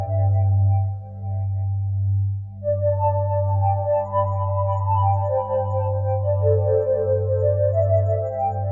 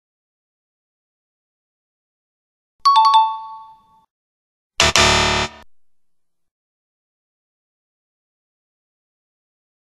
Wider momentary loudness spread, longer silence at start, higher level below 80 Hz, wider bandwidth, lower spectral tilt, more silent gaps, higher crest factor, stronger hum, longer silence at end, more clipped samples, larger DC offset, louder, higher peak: second, 6 LU vs 19 LU; second, 0 s vs 2.85 s; second, -52 dBFS vs -40 dBFS; second, 2.5 kHz vs 13 kHz; first, -11.5 dB/octave vs -2 dB/octave; second, none vs 4.10-4.70 s; second, 12 dB vs 22 dB; neither; second, 0 s vs 4.4 s; neither; neither; second, -22 LUFS vs -14 LUFS; second, -8 dBFS vs 0 dBFS